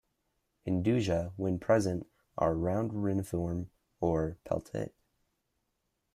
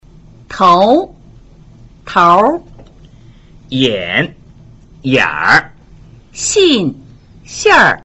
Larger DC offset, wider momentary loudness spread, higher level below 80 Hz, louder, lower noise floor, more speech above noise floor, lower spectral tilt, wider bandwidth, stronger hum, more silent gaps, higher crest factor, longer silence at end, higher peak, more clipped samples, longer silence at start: neither; second, 11 LU vs 16 LU; second, -56 dBFS vs -42 dBFS; second, -32 LUFS vs -11 LUFS; first, -81 dBFS vs -40 dBFS; first, 50 dB vs 29 dB; first, -7.5 dB/octave vs -3.5 dB/octave; first, 14.5 kHz vs 8.2 kHz; neither; neither; about the same, 18 dB vs 14 dB; first, 1.25 s vs 0.05 s; second, -14 dBFS vs 0 dBFS; neither; first, 0.65 s vs 0.5 s